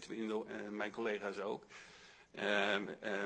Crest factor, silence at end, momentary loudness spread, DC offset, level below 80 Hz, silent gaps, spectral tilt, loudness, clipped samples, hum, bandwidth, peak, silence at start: 20 dB; 0 s; 20 LU; under 0.1%; -80 dBFS; none; -4 dB/octave; -40 LUFS; under 0.1%; none; 10 kHz; -20 dBFS; 0 s